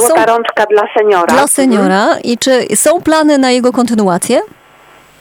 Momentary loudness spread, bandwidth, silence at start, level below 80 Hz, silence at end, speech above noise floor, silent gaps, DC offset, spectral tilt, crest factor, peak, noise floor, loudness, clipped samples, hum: 4 LU; 19 kHz; 0 s; -52 dBFS; 0.75 s; 32 dB; none; under 0.1%; -3.5 dB/octave; 10 dB; 0 dBFS; -41 dBFS; -10 LUFS; under 0.1%; none